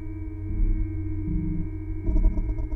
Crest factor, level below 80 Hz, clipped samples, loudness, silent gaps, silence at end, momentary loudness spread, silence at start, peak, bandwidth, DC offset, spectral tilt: 14 dB; -26 dBFS; under 0.1%; -30 LUFS; none; 0 s; 7 LU; 0 s; -10 dBFS; 2.4 kHz; under 0.1%; -11.5 dB/octave